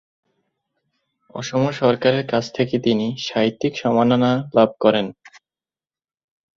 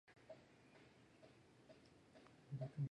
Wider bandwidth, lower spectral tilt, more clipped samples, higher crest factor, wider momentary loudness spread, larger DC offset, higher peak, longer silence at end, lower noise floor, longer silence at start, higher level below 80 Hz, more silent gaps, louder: second, 7.4 kHz vs 10 kHz; second, -6 dB/octave vs -8 dB/octave; neither; about the same, 20 dB vs 20 dB; second, 7 LU vs 17 LU; neither; first, -2 dBFS vs -36 dBFS; first, 1.45 s vs 0.05 s; first, under -90 dBFS vs -68 dBFS; first, 1.35 s vs 0.1 s; first, -58 dBFS vs -84 dBFS; neither; first, -19 LUFS vs -58 LUFS